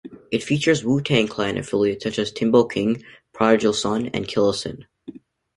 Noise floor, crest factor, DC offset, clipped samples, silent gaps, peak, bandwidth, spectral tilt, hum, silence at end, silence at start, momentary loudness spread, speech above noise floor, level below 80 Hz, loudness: -42 dBFS; 20 dB; under 0.1%; under 0.1%; none; -2 dBFS; 11.5 kHz; -5 dB/octave; none; 0.45 s; 0.05 s; 10 LU; 21 dB; -54 dBFS; -21 LUFS